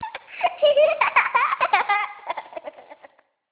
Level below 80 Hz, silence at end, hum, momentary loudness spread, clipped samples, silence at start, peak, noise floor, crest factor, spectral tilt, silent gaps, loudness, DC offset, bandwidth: -70 dBFS; 0.6 s; none; 18 LU; under 0.1%; 0 s; -4 dBFS; -53 dBFS; 20 dB; -4.5 dB/octave; none; -20 LUFS; under 0.1%; 4 kHz